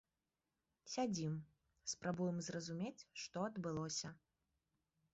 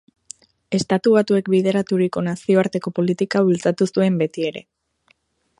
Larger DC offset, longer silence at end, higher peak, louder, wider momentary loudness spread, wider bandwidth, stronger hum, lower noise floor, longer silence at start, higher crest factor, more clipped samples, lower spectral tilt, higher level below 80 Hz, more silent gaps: neither; about the same, 0.95 s vs 1 s; second, -28 dBFS vs -2 dBFS; second, -45 LUFS vs -19 LUFS; about the same, 9 LU vs 10 LU; second, 8 kHz vs 11.5 kHz; neither; first, under -90 dBFS vs -62 dBFS; first, 0.85 s vs 0.7 s; about the same, 18 dB vs 18 dB; neither; about the same, -5.5 dB/octave vs -6.5 dB/octave; second, -78 dBFS vs -62 dBFS; neither